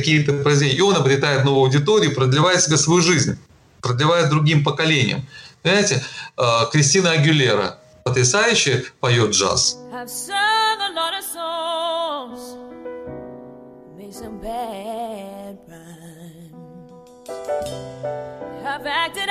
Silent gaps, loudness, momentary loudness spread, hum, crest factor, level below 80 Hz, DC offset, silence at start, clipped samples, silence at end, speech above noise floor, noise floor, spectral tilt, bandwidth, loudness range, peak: none; -18 LUFS; 19 LU; none; 14 dB; -54 dBFS; under 0.1%; 0 s; under 0.1%; 0 s; 25 dB; -43 dBFS; -4 dB/octave; 15 kHz; 16 LU; -6 dBFS